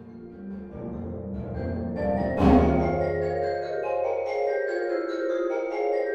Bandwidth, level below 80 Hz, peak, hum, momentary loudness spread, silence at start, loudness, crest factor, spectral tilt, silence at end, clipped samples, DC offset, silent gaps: 8 kHz; -38 dBFS; -6 dBFS; none; 16 LU; 0 s; -26 LUFS; 20 dB; -8.5 dB/octave; 0 s; under 0.1%; under 0.1%; none